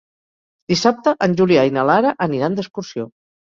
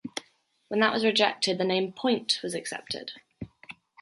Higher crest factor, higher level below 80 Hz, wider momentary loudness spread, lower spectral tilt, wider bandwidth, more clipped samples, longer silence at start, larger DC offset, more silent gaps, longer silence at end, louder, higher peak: second, 16 dB vs 22 dB; first, -56 dBFS vs -66 dBFS; second, 14 LU vs 21 LU; first, -5.5 dB/octave vs -3.5 dB/octave; second, 7.6 kHz vs 11.5 kHz; neither; first, 0.7 s vs 0.05 s; neither; neither; first, 0.5 s vs 0.3 s; first, -17 LUFS vs -27 LUFS; first, -2 dBFS vs -8 dBFS